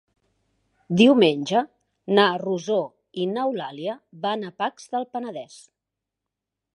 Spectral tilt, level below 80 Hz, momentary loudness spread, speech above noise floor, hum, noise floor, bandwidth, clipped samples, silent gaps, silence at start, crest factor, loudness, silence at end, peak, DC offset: -5.5 dB/octave; -72 dBFS; 17 LU; 63 dB; none; -85 dBFS; 11.5 kHz; under 0.1%; none; 0.9 s; 22 dB; -23 LUFS; 1.2 s; -2 dBFS; under 0.1%